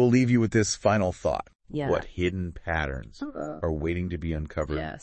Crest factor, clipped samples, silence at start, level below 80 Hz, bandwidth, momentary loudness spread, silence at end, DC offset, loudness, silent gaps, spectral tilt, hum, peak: 18 dB; under 0.1%; 0 s; -44 dBFS; 8.6 kHz; 12 LU; 0.05 s; under 0.1%; -27 LUFS; 1.55-1.59 s; -6 dB/octave; none; -8 dBFS